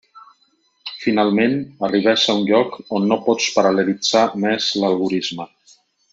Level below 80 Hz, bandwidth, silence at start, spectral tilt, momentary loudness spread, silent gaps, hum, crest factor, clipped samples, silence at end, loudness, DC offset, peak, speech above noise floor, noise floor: -64 dBFS; 7.8 kHz; 0.15 s; -4 dB/octave; 9 LU; none; none; 18 dB; under 0.1%; 0.65 s; -18 LUFS; under 0.1%; -2 dBFS; 44 dB; -62 dBFS